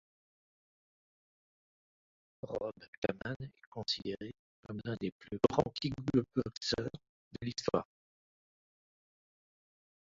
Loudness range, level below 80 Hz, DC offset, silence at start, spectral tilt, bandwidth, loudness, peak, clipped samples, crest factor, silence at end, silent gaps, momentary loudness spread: 9 LU; -64 dBFS; under 0.1%; 2.45 s; -4.5 dB/octave; 7.6 kHz; -37 LUFS; -12 dBFS; under 0.1%; 28 dB; 2.25 s; 2.88-3.02 s, 3.36-3.40 s, 3.67-3.72 s, 4.39-4.63 s, 5.12-5.20 s, 6.57-6.61 s, 7.09-7.31 s; 15 LU